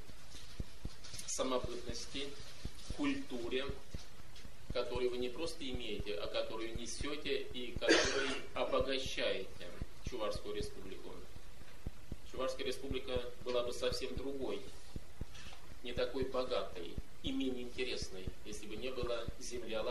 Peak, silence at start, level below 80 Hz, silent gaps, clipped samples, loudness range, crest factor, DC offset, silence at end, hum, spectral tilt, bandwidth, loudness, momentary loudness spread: -16 dBFS; 0 s; -52 dBFS; none; under 0.1%; 7 LU; 26 dB; 1%; 0 s; none; -3.5 dB/octave; 13 kHz; -40 LUFS; 15 LU